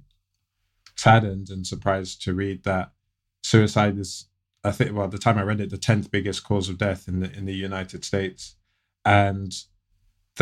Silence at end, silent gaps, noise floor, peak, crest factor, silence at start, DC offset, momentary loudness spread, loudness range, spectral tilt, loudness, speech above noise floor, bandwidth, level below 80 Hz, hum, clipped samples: 0 s; none; -76 dBFS; -2 dBFS; 22 dB; 0.95 s; under 0.1%; 14 LU; 3 LU; -5.5 dB/octave; -24 LUFS; 53 dB; 12.5 kHz; -52 dBFS; none; under 0.1%